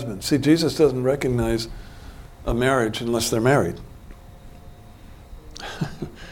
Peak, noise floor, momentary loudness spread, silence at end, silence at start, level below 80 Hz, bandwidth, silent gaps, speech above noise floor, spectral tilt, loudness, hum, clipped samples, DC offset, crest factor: -6 dBFS; -43 dBFS; 23 LU; 0 s; 0 s; -40 dBFS; 18 kHz; none; 22 dB; -5.5 dB/octave; -22 LUFS; none; under 0.1%; under 0.1%; 18 dB